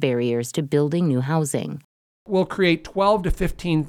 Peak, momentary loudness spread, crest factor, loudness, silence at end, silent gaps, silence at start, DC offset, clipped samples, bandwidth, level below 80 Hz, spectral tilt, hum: -6 dBFS; 6 LU; 16 dB; -22 LUFS; 0 s; 1.84-2.26 s; 0 s; under 0.1%; under 0.1%; 15.5 kHz; -36 dBFS; -6 dB/octave; none